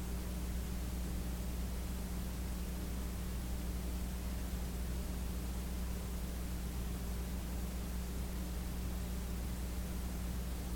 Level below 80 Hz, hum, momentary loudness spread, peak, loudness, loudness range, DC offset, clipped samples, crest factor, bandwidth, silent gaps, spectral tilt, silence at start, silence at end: -40 dBFS; none; 1 LU; -28 dBFS; -42 LUFS; 0 LU; under 0.1%; under 0.1%; 10 dB; 17.5 kHz; none; -5.5 dB/octave; 0 s; 0 s